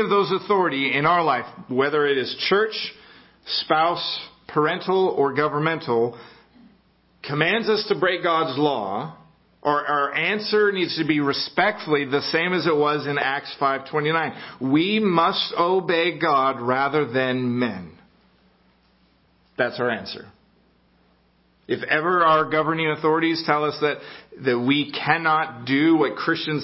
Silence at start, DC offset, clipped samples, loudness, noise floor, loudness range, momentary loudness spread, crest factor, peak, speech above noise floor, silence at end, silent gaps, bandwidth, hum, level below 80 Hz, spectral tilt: 0 s; under 0.1%; under 0.1%; -22 LUFS; -61 dBFS; 6 LU; 8 LU; 20 dB; -2 dBFS; 40 dB; 0 s; none; 5.8 kHz; none; -64 dBFS; -9 dB/octave